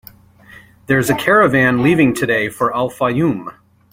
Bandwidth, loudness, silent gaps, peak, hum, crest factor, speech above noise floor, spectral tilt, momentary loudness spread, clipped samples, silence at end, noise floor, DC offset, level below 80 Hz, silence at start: 16.5 kHz; -15 LUFS; none; 0 dBFS; none; 16 dB; 29 dB; -6 dB/octave; 7 LU; under 0.1%; 0.4 s; -43 dBFS; under 0.1%; -48 dBFS; 0.9 s